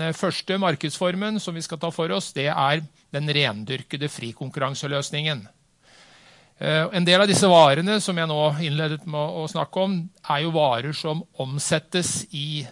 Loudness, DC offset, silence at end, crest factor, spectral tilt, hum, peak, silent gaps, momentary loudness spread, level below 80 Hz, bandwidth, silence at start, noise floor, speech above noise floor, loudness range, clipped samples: -23 LUFS; under 0.1%; 0 s; 20 dB; -4.5 dB/octave; none; -4 dBFS; none; 13 LU; -66 dBFS; 11.5 kHz; 0 s; -55 dBFS; 32 dB; 7 LU; under 0.1%